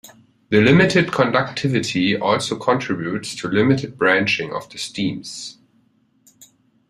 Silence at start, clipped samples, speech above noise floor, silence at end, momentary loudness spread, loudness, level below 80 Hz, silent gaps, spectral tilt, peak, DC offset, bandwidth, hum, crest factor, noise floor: 0.05 s; under 0.1%; 42 dB; 0.45 s; 14 LU; -19 LUFS; -56 dBFS; none; -5.5 dB/octave; -2 dBFS; under 0.1%; 14.5 kHz; none; 18 dB; -60 dBFS